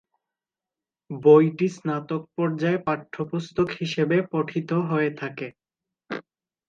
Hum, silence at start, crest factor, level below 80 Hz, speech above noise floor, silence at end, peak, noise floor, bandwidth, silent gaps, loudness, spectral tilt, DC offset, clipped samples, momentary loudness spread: none; 1.1 s; 20 dB; -64 dBFS; 67 dB; 0.5 s; -4 dBFS; -90 dBFS; 7.6 kHz; none; -24 LUFS; -7.5 dB/octave; under 0.1%; under 0.1%; 19 LU